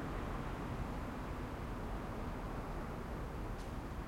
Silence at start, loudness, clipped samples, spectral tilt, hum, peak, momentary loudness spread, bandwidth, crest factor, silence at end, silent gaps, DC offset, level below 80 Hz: 0 s; -44 LUFS; under 0.1%; -7 dB/octave; none; -30 dBFS; 2 LU; 16.5 kHz; 12 dB; 0 s; none; under 0.1%; -46 dBFS